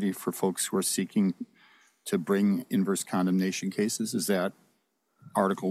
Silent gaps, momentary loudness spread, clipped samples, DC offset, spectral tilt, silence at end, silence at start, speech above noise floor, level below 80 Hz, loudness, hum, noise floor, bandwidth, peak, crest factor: none; 7 LU; under 0.1%; under 0.1%; -5 dB/octave; 0 s; 0 s; 46 dB; -82 dBFS; -28 LUFS; none; -73 dBFS; 16 kHz; -12 dBFS; 18 dB